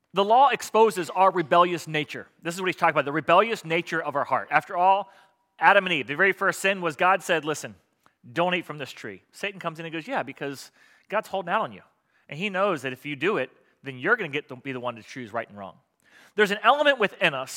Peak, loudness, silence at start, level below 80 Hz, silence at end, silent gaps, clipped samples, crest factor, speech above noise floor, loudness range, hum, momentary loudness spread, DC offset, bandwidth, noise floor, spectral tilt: -2 dBFS; -24 LUFS; 0.15 s; -80 dBFS; 0 s; none; under 0.1%; 24 dB; 33 dB; 9 LU; none; 16 LU; under 0.1%; 17 kHz; -57 dBFS; -4 dB/octave